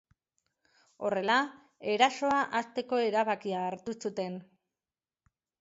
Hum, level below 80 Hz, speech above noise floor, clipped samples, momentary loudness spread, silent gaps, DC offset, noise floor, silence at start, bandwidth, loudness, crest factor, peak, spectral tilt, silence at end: none; -76 dBFS; over 60 dB; under 0.1%; 11 LU; none; under 0.1%; under -90 dBFS; 1 s; 8 kHz; -31 LUFS; 24 dB; -10 dBFS; -4 dB/octave; 1.2 s